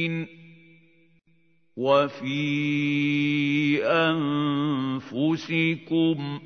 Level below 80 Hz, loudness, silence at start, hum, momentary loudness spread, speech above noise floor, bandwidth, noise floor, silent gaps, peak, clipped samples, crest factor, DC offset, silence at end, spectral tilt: -72 dBFS; -24 LUFS; 0 s; none; 7 LU; 41 dB; 6.6 kHz; -66 dBFS; none; -8 dBFS; under 0.1%; 18 dB; under 0.1%; 0 s; -7 dB/octave